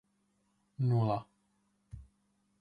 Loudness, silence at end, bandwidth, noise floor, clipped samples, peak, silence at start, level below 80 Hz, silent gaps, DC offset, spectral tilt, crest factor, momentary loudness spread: -33 LUFS; 0.55 s; 4.9 kHz; -76 dBFS; under 0.1%; -20 dBFS; 0.8 s; -64 dBFS; none; under 0.1%; -10 dB/octave; 18 dB; 24 LU